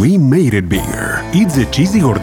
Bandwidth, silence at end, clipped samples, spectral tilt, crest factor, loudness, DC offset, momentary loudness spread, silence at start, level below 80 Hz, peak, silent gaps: 19 kHz; 0 s; under 0.1%; -6 dB/octave; 12 dB; -13 LUFS; under 0.1%; 7 LU; 0 s; -30 dBFS; 0 dBFS; none